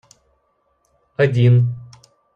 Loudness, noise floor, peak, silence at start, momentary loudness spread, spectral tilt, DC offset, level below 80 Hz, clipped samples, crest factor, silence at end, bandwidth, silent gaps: -16 LUFS; -65 dBFS; -4 dBFS; 1.2 s; 20 LU; -8.5 dB/octave; under 0.1%; -56 dBFS; under 0.1%; 16 dB; 0.5 s; 6.4 kHz; none